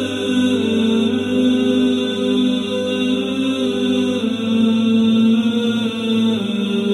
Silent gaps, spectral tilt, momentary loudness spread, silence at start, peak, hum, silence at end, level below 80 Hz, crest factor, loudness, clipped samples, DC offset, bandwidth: none; -5.5 dB/octave; 5 LU; 0 s; -6 dBFS; none; 0 s; -56 dBFS; 10 dB; -17 LUFS; under 0.1%; under 0.1%; 11.5 kHz